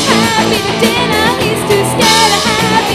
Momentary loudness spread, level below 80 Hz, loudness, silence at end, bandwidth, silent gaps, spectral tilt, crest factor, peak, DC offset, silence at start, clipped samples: 4 LU; -36 dBFS; -10 LUFS; 0 s; 15 kHz; none; -3 dB/octave; 10 dB; 0 dBFS; under 0.1%; 0 s; under 0.1%